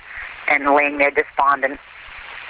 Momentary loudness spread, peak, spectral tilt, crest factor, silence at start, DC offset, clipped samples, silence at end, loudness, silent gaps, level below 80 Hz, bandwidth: 20 LU; -6 dBFS; -6.5 dB/octave; 14 dB; 0.05 s; under 0.1%; under 0.1%; 0 s; -17 LUFS; none; -52 dBFS; 4 kHz